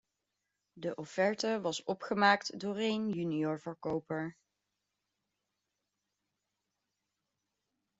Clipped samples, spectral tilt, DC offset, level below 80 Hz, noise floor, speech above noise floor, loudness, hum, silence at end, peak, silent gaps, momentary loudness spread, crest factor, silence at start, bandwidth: under 0.1%; -5 dB/octave; under 0.1%; -78 dBFS; -86 dBFS; 53 dB; -34 LUFS; none; 3.65 s; -12 dBFS; none; 12 LU; 24 dB; 0.75 s; 8 kHz